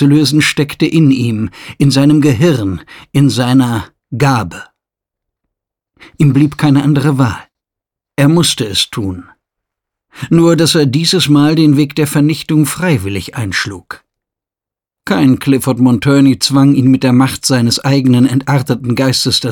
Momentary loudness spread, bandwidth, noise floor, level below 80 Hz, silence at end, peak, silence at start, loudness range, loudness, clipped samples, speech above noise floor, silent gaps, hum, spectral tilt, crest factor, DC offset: 12 LU; 19 kHz; -87 dBFS; -46 dBFS; 0 s; 0 dBFS; 0 s; 5 LU; -11 LUFS; under 0.1%; 77 dB; none; none; -5.5 dB/octave; 12 dB; under 0.1%